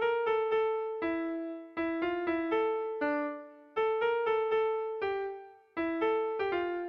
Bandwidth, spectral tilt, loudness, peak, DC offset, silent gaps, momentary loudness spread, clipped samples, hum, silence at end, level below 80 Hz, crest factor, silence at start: 5.4 kHz; -6.5 dB/octave; -32 LUFS; -20 dBFS; under 0.1%; none; 9 LU; under 0.1%; none; 0 s; -68 dBFS; 12 dB; 0 s